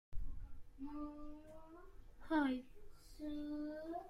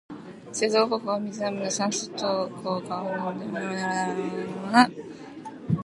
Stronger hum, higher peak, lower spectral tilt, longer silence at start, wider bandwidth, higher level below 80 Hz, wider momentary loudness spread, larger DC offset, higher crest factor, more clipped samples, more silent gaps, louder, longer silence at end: neither; second, -26 dBFS vs -2 dBFS; first, -6.5 dB/octave vs -4.5 dB/octave; about the same, 0.1 s vs 0.1 s; about the same, 12.5 kHz vs 11.5 kHz; first, -54 dBFS vs -64 dBFS; first, 25 LU vs 18 LU; neither; second, 18 dB vs 24 dB; neither; neither; second, -45 LUFS vs -27 LUFS; about the same, 0 s vs 0.05 s